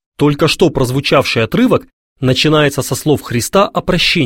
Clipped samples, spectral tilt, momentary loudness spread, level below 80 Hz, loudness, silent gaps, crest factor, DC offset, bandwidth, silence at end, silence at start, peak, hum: under 0.1%; -5 dB/octave; 4 LU; -36 dBFS; -13 LUFS; 1.93-2.16 s; 12 dB; 0.2%; 17 kHz; 0 s; 0.2 s; 0 dBFS; none